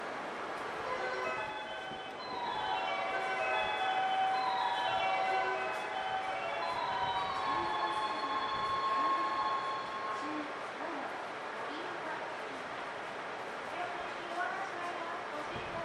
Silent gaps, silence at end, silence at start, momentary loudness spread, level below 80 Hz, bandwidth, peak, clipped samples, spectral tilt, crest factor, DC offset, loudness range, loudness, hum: none; 0 s; 0 s; 9 LU; -70 dBFS; 12.5 kHz; -20 dBFS; under 0.1%; -3 dB/octave; 16 dB; under 0.1%; 7 LU; -36 LUFS; none